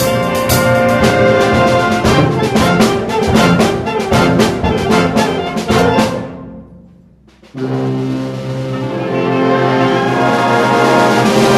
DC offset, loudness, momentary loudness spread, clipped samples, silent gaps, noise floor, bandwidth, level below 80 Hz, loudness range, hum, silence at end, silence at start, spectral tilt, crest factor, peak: under 0.1%; -12 LUFS; 10 LU; under 0.1%; none; -44 dBFS; 16.5 kHz; -34 dBFS; 7 LU; none; 0 s; 0 s; -5.5 dB/octave; 12 dB; 0 dBFS